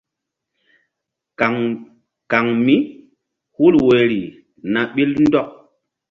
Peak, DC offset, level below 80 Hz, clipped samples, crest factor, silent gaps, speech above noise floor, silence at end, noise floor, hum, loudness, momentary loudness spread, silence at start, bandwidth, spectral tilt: 0 dBFS; under 0.1%; -54 dBFS; under 0.1%; 18 dB; none; 66 dB; 0.6 s; -81 dBFS; none; -17 LUFS; 16 LU; 1.4 s; 7 kHz; -7.5 dB/octave